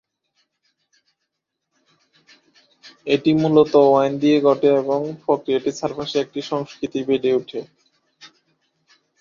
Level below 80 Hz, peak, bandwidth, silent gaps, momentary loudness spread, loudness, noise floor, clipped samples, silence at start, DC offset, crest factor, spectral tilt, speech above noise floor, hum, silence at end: -64 dBFS; -2 dBFS; 7.4 kHz; none; 12 LU; -19 LUFS; -79 dBFS; under 0.1%; 2.85 s; under 0.1%; 18 dB; -6.5 dB/octave; 60 dB; none; 0.95 s